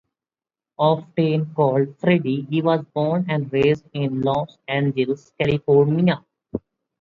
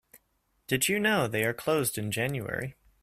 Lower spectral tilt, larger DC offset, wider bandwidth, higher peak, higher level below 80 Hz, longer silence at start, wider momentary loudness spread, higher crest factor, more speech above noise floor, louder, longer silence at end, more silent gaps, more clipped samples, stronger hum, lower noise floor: first, -9 dB/octave vs -4 dB/octave; neither; second, 7.2 kHz vs 16 kHz; first, -4 dBFS vs -12 dBFS; about the same, -56 dBFS vs -60 dBFS; first, 0.8 s vs 0.15 s; about the same, 8 LU vs 9 LU; about the same, 18 dB vs 18 dB; first, over 70 dB vs 45 dB; first, -21 LUFS vs -28 LUFS; first, 0.45 s vs 0.3 s; neither; neither; neither; first, under -90 dBFS vs -73 dBFS